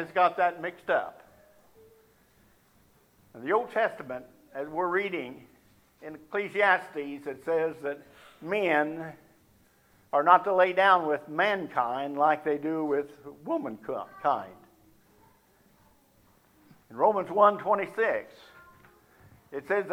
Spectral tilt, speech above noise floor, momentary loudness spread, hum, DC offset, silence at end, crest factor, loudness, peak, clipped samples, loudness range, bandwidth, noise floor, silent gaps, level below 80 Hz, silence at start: -6 dB/octave; 36 dB; 20 LU; none; under 0.1%; 0 s; 24 dB; -27 LUFS; -4 dBFS; under 0.1%; 9 LU; 16 kHz; -63 dBFS; none; -74 dBFS; 0 s